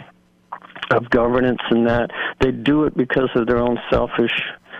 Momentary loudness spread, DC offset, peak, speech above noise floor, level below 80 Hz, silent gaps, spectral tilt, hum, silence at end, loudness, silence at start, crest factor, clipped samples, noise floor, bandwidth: 7 LU; under 0.1%; -4 dBFS; 32 dB; -38 dBFS; none; -7.5 dB/octave; none; 0 s; -19 LUFS; 0 s; 16 dB; under 0.1%; -50 dBFS; 7.8 kHz